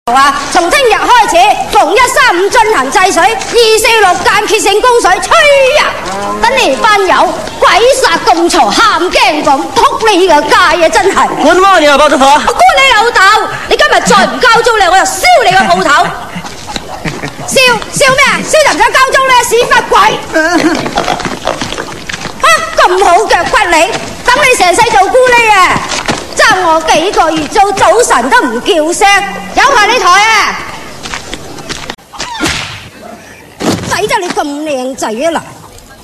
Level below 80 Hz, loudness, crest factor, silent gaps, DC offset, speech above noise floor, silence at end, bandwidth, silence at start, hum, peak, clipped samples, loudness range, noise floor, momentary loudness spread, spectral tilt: -34 dBFS; -7 LUFS; 8 dB; none; 3%; 24 dB; 0 s; 18 kHz; 0.05 s; none; 0 dBFS; 2%; 5 LU; -31 dBFS; 12 LU; -2 dB/octave